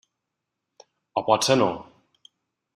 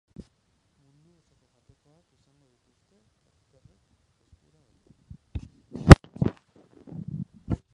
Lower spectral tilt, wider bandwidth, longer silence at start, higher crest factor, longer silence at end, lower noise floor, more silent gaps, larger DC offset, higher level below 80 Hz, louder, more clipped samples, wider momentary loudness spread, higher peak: second, -4 dB/octave vs -7 dB/octave; first, 14 kHz vs 11 kHz; second, 1.15 s vs 5.35 s; about the same, 24 dB vs 26 dB; first, 0.95 s vs 0.2 s; first, -83 dBFS vs -70 dBFS; neither; neither; second, -66 dBFS vs -34 dBFS; second, -22 LUFS vs -19 LUFS; neither; second, 13 LU vs 26 LU; second, -4 dBFS vs 0 dBFS